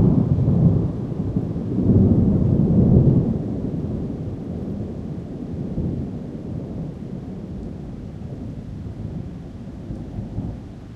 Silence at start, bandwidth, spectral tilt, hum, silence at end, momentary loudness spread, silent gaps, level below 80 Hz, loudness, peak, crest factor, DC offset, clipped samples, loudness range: 0 s; 5.6 kHz; -11.5 dB/octave; none; 0 s; 17 LU; none; -34 dBFS; -22 LUFS; -2 dBFS; 18 dB; under 0.1%; under 0.1%; 14 LU